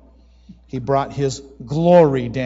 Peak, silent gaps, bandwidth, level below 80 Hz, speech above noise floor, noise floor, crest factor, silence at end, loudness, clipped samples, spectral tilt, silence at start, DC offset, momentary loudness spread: -2 dBFS; none; 8 kHz; -46 dBFS; 31 dB; -48 dBFS; 16 dB; 0 s; -17 LUFS; under 0.1%; -7 dB/octave; 0.5 s; under 0.1%; 18 LU